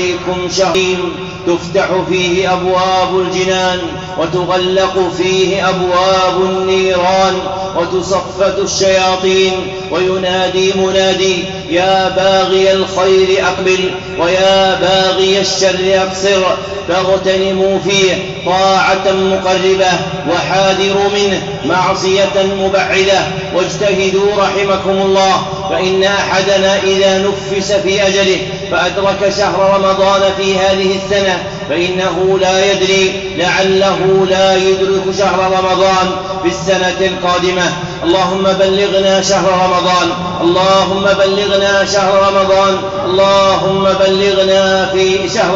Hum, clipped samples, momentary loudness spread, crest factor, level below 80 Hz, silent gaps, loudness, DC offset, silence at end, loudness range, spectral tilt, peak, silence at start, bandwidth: none; under 0.1%; 6 LU; 10 dB; -40 dBFS; none; -12 LUFS; 0.1%; 0 s; 2 LU; -4 dB/octave; -2 dBFS; 0 s; 7.8 kHz